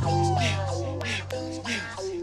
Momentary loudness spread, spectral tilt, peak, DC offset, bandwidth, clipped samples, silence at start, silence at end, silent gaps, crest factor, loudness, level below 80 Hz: 8 LU; -5 dB/octave; -12 dBFS; under 0.1%; 12 kHz; under 0.1%; 0 s; 0 s; none; 16 dB; -28 LUFS; -54 dBFS